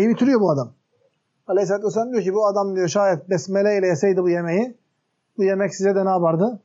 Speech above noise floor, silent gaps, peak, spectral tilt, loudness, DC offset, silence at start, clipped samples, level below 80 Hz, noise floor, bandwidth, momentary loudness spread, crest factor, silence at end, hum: 53 dB; none; -8 dBFS; -6.5 dB/octave; -20 LUFS; under 0.1%; 0 s; under 0.1%; -78 dBFS; -72 dBFS; 7.8 kHz; 5 LU; 12 dB; 0.05 s; none